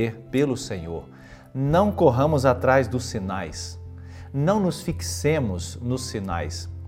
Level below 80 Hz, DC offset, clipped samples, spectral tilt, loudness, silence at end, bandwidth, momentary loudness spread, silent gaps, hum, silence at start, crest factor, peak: -46 dBFS; under 0.1%; under 0.1%; -6 dB/octave; -24 LUFS; 0 s; 16 kHz; 15 LU; none; none; 0 s; 20 dB; -4 dBFS